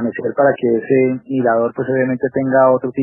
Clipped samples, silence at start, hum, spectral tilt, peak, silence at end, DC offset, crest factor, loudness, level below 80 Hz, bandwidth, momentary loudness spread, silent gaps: under 0.1%; 0 s; none; -12.5 dB/octave; -2 dBFS; 0 s; under 0.1%; 14 dB; -16 LUFS; -64 dBFS; 3.2 kHz; 5 LU; none